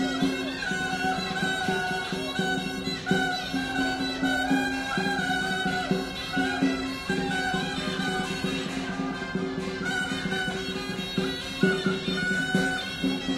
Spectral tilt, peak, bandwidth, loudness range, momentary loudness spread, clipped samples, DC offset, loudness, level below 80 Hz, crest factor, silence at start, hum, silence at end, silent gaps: -4.5 dB/octave; -10 dBFS; 15.5 kHz; 3 LU; 5 LU; under 0.1%; under 0.1%; -28 LUFS; -50 dBFS; 18 dB; 0 s; none; 0 s; none